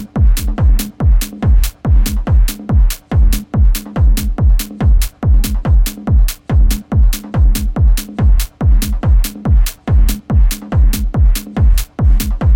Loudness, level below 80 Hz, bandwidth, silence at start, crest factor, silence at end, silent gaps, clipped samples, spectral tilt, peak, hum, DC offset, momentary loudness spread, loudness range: -15 LUFS; -12 dBFS; 17 kHz; 0 s; 8 dB; 0 s; none; under 0.1%; -6 dB/octave; -2 dBFS; none; under 0.1%; 1 LU; 0 LU